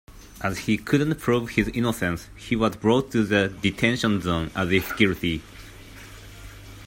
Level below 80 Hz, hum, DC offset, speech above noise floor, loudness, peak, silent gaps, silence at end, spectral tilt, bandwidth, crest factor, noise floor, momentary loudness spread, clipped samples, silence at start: -46 dBFS; none; under 0.1%; 20 dB; -24 LUFS; -4 dBFS; none; 0 s; -5.5 dB/octave; 16.5 kHz; 20 dB; -43 dBFS; 21 LU; under 0.1%; 0.1 s